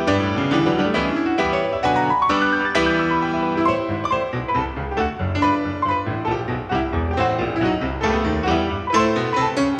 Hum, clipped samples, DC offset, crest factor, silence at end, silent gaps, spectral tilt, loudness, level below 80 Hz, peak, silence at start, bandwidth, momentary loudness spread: none; under 0.1%; under 0.1%; 16 dB; 0 s; none; -6 dB/octave; -20 LUFS; -36 dBFS; -4 dBFS; 0 s; 9.6 kHz; 5 LU